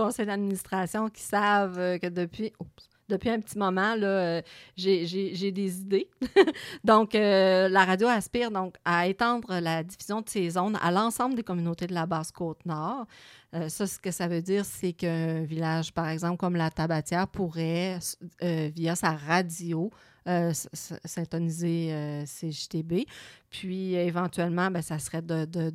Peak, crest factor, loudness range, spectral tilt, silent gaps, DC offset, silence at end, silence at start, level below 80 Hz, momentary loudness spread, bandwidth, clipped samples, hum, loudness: -6 dBFS; 22 dB; 8 LU; -5.5 dB/octave; none; under 0.1%; 0 s; 0 s; -62 dBFS; 12 LU; 16 kHz; under 0.1%; none; -28 LUFS